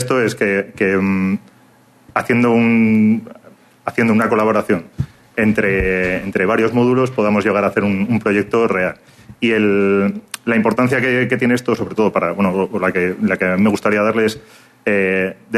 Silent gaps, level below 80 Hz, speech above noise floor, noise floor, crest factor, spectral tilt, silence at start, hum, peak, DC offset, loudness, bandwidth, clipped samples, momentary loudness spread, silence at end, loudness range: none; -44 dBFS; 34 dB; -50 dBFS; 16 dB; -7 dB/octave; 0 s; none; -2 dBFS; under 0.1%; -16 LUFS; 13.5 kHz; under 0.1%; 7 LU; 0 s; 1 LU